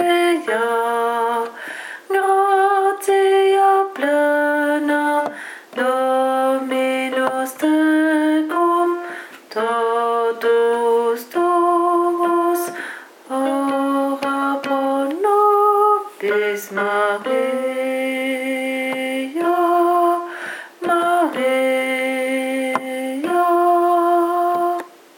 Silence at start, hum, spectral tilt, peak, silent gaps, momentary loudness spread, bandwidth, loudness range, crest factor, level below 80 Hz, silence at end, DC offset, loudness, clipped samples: 0 s; none; -3.5 dB/octave; -2 dBFS; none; 8 LU; 17 kHz; 3 LU; 16 dB; -84 dBFS; 0.3 s; under 0.1%; -18 LUFS; under 0.1%